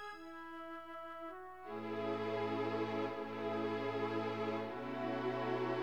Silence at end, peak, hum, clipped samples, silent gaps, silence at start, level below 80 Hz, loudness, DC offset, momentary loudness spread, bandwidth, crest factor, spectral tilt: 0 s; -26 dBFS; 60 Hz at -75 dBFS; under 0.1%; none; 0 s; -74 dBFS; -41 LUFS; under 0.1%; 10 LU; 13.5 kHz; 14 dB; -7 dB/octave